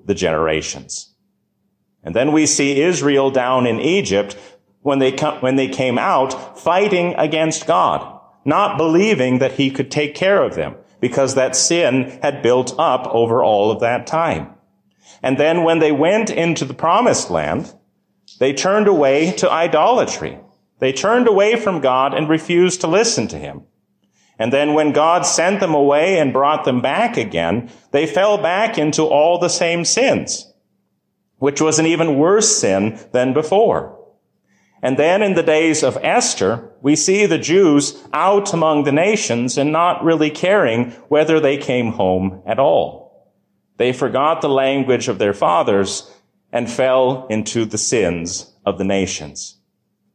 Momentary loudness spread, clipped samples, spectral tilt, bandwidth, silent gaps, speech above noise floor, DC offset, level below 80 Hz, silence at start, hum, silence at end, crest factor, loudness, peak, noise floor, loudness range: 9 LU; under 0.1%; -4 dB/octave; 10.5 kHz; none; 53 dB; under 0.1%; -50 dBFS; 0.05 s; none; 0.65 s; 14 dB; -16 LUFS; -4 dBFS; -69 dBFS; 3 LU